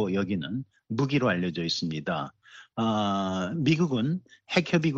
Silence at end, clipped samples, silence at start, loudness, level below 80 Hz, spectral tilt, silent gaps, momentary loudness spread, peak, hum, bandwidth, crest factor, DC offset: 0 s; under 0.1%; 0 s; -28 LUFS; -64 dBFS; -6 dB/octave; none; 10 LU; -6 dBFS; none; 7.8 kHz; 20 dB; under 0.1%